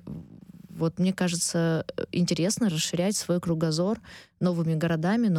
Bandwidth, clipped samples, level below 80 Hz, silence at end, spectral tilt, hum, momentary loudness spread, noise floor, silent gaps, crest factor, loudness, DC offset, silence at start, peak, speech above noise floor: 15 kHz; under 0.1%; -60 dBFS; 0 s; -5 dB/octave; none; 6 LU; -47 dBFS; none; 14 dB; -27 LUFS; under 0.1%; 0.05 s; -14 dBFS; 21 dB